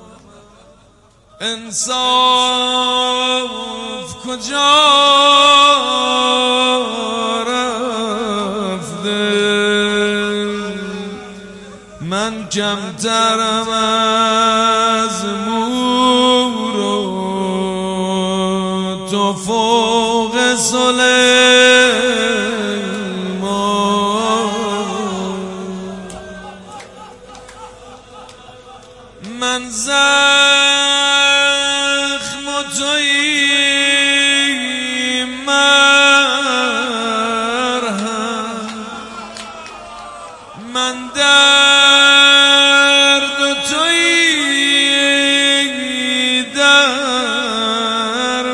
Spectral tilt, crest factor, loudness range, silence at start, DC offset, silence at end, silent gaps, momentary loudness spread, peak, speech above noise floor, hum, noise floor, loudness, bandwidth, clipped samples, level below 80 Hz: -2 dB/octave; 14 dB; 11 LU; 0.1 s; under 0.1%; 0 s; none; 16 LU; 0 dBFS; 35 dB; none; -49 dBFS; -12 LUFS; 11.5 kHz; under 0.1%; -52 dBFS